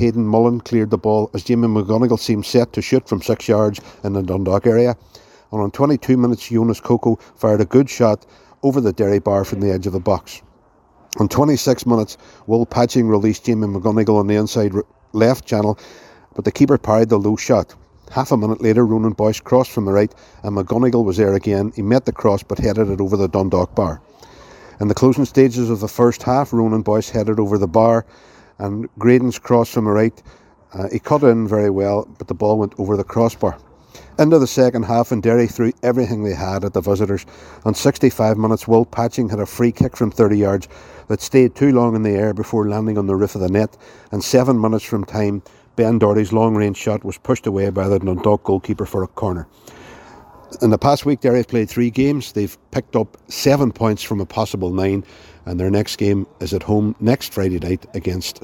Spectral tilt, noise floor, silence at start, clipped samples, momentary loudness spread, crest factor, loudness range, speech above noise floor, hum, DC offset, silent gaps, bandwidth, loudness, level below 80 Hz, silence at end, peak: -7 dB/octave; -53 dBFS; 0 s; under 0.1%; 9 LU; 16 dB; 3 LU; 36 dB; none; under 0.1%; none; 17 kHz; -17 LUFS; -44 dBFS; 0.05 s; 0 dBFS